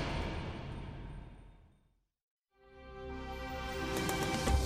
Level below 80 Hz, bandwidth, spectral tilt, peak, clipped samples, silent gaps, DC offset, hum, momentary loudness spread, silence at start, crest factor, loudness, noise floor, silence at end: -44 dBFS; 15.5 kHz; -4.5 dB/octave; -20 dBFS; under 0.1%; 2.23-2.42 s; under 0.1%; none; 19 LU; 0 s; 20 dB; -39 LUFS; -73 dBFS; 0 s